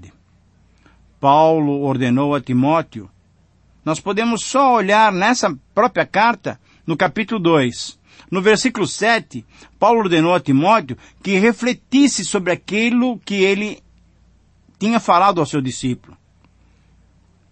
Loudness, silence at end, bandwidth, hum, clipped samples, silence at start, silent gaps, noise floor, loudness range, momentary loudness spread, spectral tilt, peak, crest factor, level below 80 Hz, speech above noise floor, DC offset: -17 LUFS; 1.55 s; 8.8 kHz; none; under 0.1%; 0 s; none; -55 dBFS; 3 LU; 13 LU; -5 dB/octave; -2 dBFS; 16 dB; -54 dBFS; 38 dB; under 0.1%